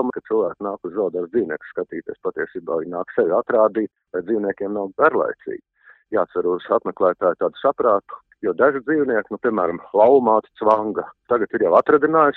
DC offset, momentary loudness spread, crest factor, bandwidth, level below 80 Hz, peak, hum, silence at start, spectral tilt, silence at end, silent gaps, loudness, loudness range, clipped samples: under 0.1%; 12 LU; 18 dB; 4.2 kHz; -62 dBFS; -2 dBFS; none; 0 s; -9 dB/octave; 0 s; none; -20 LUFS; 4 LU; under 0.1%